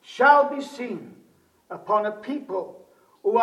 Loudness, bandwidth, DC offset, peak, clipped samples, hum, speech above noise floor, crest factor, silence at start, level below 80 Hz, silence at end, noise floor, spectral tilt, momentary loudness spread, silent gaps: -23 LUFS; 12 kHz; under 0.1%; -4 dBFS; under 0.1%; none; 37 dB; 20 dB; 0.1 s; -82 dBFS; 0 s; -59 dBFS; -5 dB/octave; 22 LU; none